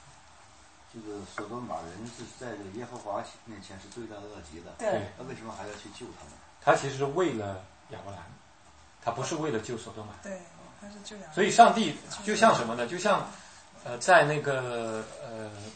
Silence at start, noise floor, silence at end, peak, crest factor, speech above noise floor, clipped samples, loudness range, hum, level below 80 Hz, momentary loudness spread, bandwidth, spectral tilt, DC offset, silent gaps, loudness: 0.95 s; -57 dBFS; 0 s; -4 dBFS; 28 dB; 27 dB; under 0.1%; 14 LU; none; -64 dBFS; 23 LU; 8.8 kHz; -4 dB/octave; under 0.1%; none; -28 LUFS